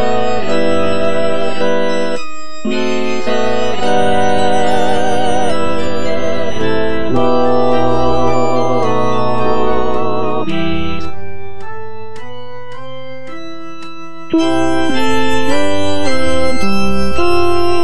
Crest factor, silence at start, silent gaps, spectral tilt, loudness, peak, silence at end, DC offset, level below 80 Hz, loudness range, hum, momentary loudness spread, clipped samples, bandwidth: 14 dB; 0 s; none; -5.5 dB/octave; -16 LUFS; 0 dBFS; 0 s; 30%; -36 dBFS; 8 LU; none; 16 LU; under 0.1%; 11 kHz